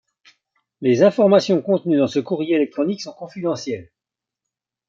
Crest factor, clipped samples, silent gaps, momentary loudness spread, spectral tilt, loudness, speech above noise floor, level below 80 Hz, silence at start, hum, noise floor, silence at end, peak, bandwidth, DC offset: 18 dB; under 0.1%; none; 14 LU; -6.5 dB/octave; -19 LUFS; 69 dB; -68 dBFS; 0.8 s; none; -87 dBFS; 1.05 s; -2 dBFS; 7.6 kHz; under 0.1%